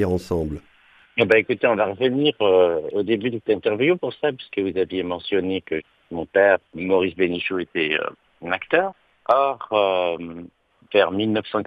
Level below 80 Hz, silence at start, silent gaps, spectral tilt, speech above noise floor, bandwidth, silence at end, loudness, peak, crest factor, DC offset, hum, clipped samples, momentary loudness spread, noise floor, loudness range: -52 dBFS; 0 s; none; -7 dB/octave; 28 dB; 9 kHz; 0 s; -21 LUFS; -2 dBFS; 18 dB; under 0.1%; none; under 0.1%; 12 LU; -49 dBFS; 3 LU